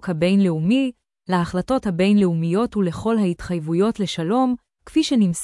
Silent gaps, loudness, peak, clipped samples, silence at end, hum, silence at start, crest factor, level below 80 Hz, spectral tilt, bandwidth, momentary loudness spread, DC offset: none; -20 LUFS; -8 dBFS; under 0.1%; 0 s; none; 0.05 s; 12 dB; -48 dBFS; -6.5 dB/octave; 12 kHz; 6 LU; under 0.1%